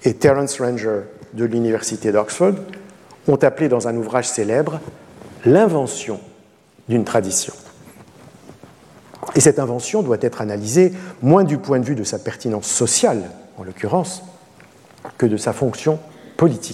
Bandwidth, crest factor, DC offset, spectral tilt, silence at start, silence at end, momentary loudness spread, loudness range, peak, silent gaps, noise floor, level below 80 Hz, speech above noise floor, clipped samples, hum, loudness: 14 kHz; 18 dB; under 0.1%; -5 dB/octave; 0 s; 0 s; 16 LU; 4 LU; 0 dBFS; none; -51 dBFS; -58 dBFS; 33 dB; under 0.1%; none; -18 LUFS